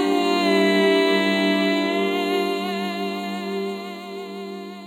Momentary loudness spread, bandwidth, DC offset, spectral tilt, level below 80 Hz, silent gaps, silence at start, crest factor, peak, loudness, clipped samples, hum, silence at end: 16 LU; 16.5 kHz; under 0.1%; -5 dB/octave; -78 dBFS; none; 0 s; 14 dB; -6 dBFS; -21 LUFS; under 0.1%; none; 0 s